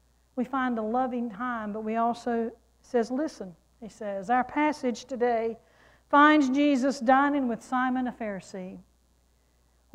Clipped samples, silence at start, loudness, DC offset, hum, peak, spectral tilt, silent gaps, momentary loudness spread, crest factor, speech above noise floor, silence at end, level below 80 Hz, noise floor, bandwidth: under 0.1%; 0.35 s; -27 LUFS; under 0.1%; none; -10 dBFS; -5 dB/octave; none; 17 LU; 18 dB; 39 dB; 1.15 s; -64 dBFS; -66 dBFS; 11 kHz